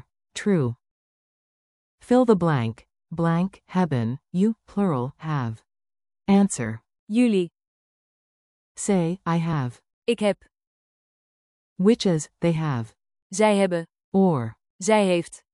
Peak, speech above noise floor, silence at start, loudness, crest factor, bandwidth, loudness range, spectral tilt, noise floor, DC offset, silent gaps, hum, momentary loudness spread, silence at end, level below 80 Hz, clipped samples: -6 dBFS; over 68 dB; 0.35 s; -24 LUFS; 18 dB; 11.5 kHz; 4 LU; -6.5 dB/octave; under -90 dBFS; under 0.1%; 0.91-1.98 s, 6.99-7.07 s, 7.67-8.75 s, 9.93-10.02 s, 10.67-11.76 s, 13.22-13.30 s, 14.04-14.12 s, 14.70-14.79 s; none; 13 LU; 0.15 s; -60 dBFS; under 0.1%